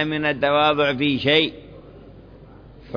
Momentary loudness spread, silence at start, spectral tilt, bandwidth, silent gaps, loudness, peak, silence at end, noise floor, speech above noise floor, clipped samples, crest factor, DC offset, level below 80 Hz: 4 LU; 0 s; -6.5 dB/octave; 5.4 kHz; none; -19 LUFS; -4 dBFS; 0 s; -44 dBFS; 24 dB; under 0.1%; 18 dB; under 0.1%; -50 dBFS